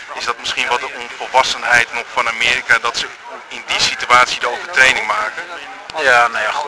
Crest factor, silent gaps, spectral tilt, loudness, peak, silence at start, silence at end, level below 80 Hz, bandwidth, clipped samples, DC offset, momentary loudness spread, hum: 16 dB; none; -0.5 dB/octave; -14 LUFS; 0 dBFS; 0 s; 0 s; -50 dBFS; 11 kHz; under 0.1%; under 0.1%; 15 LU; none